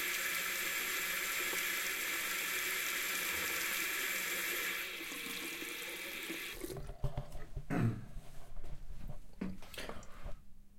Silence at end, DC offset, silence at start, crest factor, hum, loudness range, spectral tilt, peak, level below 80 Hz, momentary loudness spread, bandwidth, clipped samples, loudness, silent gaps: 0 s; under 0.1%; 0 s; 18 dB; none; 9 LU; -2 dB/octave; -22 dBFS; -52 dBFS; 18 LU; 16.5 kHz; under 0.1%; -37 LUFS; none